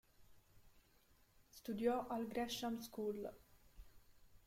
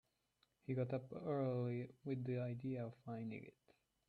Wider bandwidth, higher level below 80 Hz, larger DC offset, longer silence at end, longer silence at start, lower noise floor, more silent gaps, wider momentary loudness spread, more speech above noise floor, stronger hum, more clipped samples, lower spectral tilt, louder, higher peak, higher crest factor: first, 16.5 kHz vs 4.7 kHz; first, -68 dBFS vs -82 dBFS; neither; second, 0.05 s vs 0.6 s; second, 0.2 s vs 0.7 s; second, -72 dBFS vs -83 dBFS; neither; first, 13 LU vs 9 LU; second, 29 dB vs 39 dB; neither; neither; second, -4.5 dB/octave vs -10.5 dB/octave; about the same, -44 LUFS vs -45 LUFS; first, -26 dBFS vs -30 dBFS; first, 20 dB vs 14 dB